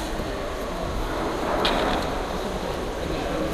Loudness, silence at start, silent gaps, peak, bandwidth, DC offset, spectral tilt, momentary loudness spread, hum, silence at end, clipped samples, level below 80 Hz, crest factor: -27 LUFS; 0 s; none; -8 dBFS; 15.5 kHz; under 0.1%; -4.5 dB/octave; 7 LU; none; 0 s; under 0.1%; -34 dBFS; 20 dB